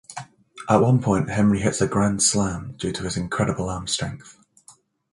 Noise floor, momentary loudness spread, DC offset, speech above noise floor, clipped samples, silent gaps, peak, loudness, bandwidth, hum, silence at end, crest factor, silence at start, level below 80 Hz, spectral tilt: -54 dBFS; 14 LU; under 0.1%; 33 dB; under 0.1%; none; -2 dBFS; -22 LUFS; 11.5 kHz; none; 0.4 s; 20 dB; 0.1 s; -46 dBFS; -5 dB/octave